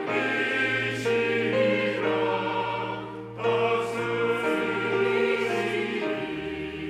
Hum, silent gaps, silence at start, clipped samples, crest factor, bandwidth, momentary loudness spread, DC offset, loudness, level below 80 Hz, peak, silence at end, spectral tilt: none; none; 0 s; under 0.1%; 14 dB; 13.5 kHz; 7 LU; under 0.1%; -26 LUFS; -62 dBFS; -12 dBFS; 0 s; -5.5 dB/octave